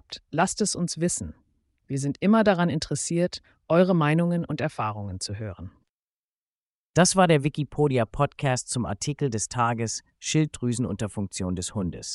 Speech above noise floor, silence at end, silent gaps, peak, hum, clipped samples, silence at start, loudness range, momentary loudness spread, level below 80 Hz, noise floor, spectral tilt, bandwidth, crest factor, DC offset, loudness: over 65 dB; 0 s; 5.89-6.94 s; -6 dBFS; none; under 0.1%; 0.1 s; 4 LU; 12 LU; -52 dBFS; under -90 dBFS; -5 dB/octave; 11.5 kHz; 20 dB; under 0.1%; -25 LUFS